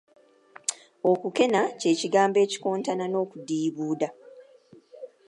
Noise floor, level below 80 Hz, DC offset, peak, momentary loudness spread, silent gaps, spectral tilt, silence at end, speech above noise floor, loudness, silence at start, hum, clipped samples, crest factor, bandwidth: -55 dBFS; -82 dBFS; under 0.1%; -8 dBFS; 10 LU; none; -4 dB/octave; 0.2 s; 30 dB; -26 LUFS; 0.7 s; none; under 0.1%; 20 dB; 11.5 kHz